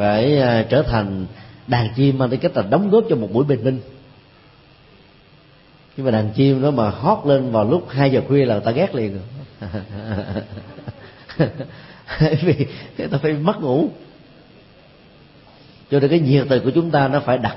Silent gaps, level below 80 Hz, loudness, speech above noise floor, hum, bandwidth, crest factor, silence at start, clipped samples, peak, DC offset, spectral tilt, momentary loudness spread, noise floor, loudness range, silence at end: none; -46 dBFS; -18 LUFS; 31 dB; none; 5.8 kHz; 16 dB; 0 s; under 0.1%; -2 dBFS; under 0.1%; -12 dB/octave; 17 LU; -49 dBFS; 7 LU; 0 s